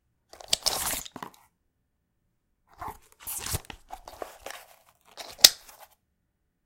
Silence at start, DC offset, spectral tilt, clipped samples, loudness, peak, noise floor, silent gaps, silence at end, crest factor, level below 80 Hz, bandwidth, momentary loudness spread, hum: 0.5 s; under 0.1%; 0.5 dB/octave; under 0.1%; -23 LUFS; 0 dBFS; -76 dBFS; none; 1.1 s; 32 dB; -54 dBFS; 17 kHz; 27 LU; none